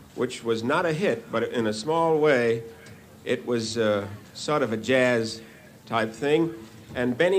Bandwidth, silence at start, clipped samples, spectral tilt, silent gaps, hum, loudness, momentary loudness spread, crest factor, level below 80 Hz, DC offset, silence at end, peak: 15.5 kHz; 0 s; under 0.1%; -5 dB/octave; none; none; -25 LUFS; 12 LU; 18 dB; -62 dBFS; under 0.1%; 0 s; -8 dBFS